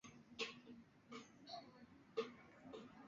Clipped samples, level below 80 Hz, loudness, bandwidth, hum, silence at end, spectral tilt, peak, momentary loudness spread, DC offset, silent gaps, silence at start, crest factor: under 0.1%; -84 dBFS; -53 LUFS; 7.4 kHz; none; 0 s; -2 dB/octave; -32 dBFS; 14 LU; under 0.1%; none; 0.05 s; 24 dB